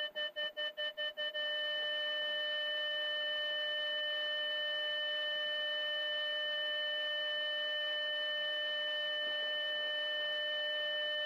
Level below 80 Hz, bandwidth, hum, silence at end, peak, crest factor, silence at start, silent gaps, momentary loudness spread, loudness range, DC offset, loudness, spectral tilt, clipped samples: -86 dBFS; 15.5 kHz; none; 0 s; -30 dBFS; 8 dB; 0 s; none; 2 LU; 0 LU; under 0.1%; -35 LUFS; 0 dB/octave; under 0.1%